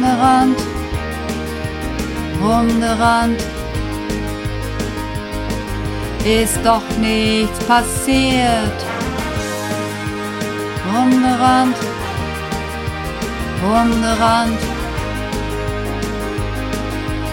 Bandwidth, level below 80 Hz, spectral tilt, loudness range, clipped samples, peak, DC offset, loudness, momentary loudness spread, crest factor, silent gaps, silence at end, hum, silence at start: 17 kHz; -30 dBFS; -5 dB/octave; 4 LU; under 0.1%; -2 dBFS; under 0.1%; -18 LUFS; 10 LU; 16 dB; none; 0 s; none; 0 s